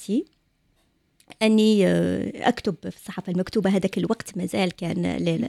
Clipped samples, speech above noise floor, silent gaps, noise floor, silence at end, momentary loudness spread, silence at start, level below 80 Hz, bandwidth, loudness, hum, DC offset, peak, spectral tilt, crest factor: under 0.1%; 44 dB; none; -66 dBFS; 0 s; 11 LU; 0 s; -56 dBFS; 13.5 kHz; -23 LUFS; none; under 0.1%; -6 dBFS; -6 dB/octave; 18 dB